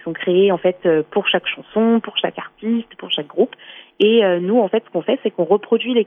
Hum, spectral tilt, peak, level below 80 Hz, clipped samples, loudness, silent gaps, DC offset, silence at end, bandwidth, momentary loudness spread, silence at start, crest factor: none; -8 dB/octave; -4 dBFS; -66 dBFS; under 0.1%; -18 LUFS; none; under 0.1%; 0 s; 3.8 kHz; 8 LU; 0.05 s; 14 dB